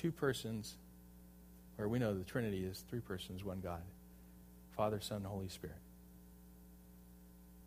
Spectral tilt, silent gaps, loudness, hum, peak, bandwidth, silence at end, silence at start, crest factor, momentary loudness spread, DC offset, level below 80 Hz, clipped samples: -6 dB/octave; none; -43 LUFS; 60 Hz at -60 dBFS; -24 dBFS; 15.5 kHz; 0 s; 0 s; 20 dB; 22 LU; under 0.1%; -62 dBFS; under 0.1%